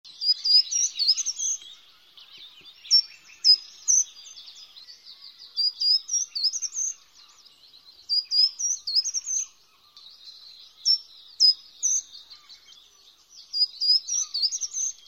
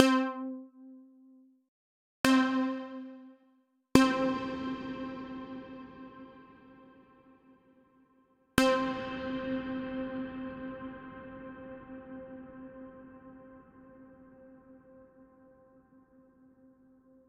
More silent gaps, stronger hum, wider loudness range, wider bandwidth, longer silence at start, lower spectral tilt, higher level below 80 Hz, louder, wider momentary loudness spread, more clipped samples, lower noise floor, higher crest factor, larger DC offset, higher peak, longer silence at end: second, none vs 1.68-2.24 s; neither; second, 3 LU vs 20 LU; first, 17.5 kHz vs 13 kHz; about the same, 0.05 s vs 0 s; second, 6 dB/octave vs -4.5 dB/octave; second, -80 dBFS vs -60 dBFS; first, -22 LUFS vs -32 LUFS; second, 21 LU vs 28 LU; neither; second, -57 dBFS vs -70 dBFS; second, 18 dB vs 32 dB; neither; second, -8 dBFS vs -4 dBFS; second, 0.15 s vs 2.05 s